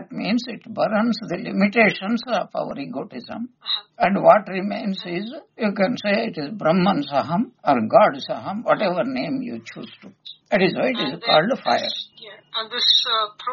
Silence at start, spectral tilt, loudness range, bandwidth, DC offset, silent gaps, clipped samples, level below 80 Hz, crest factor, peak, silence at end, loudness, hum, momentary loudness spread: 0 s; -3 dB/octave; 2 LU; 7.2 kHz; under 0.1%; none; under 0.1%; -64 dBFS; 22 dB; 0 dBFS; 0 s; -21 LUFS; none; 16 LU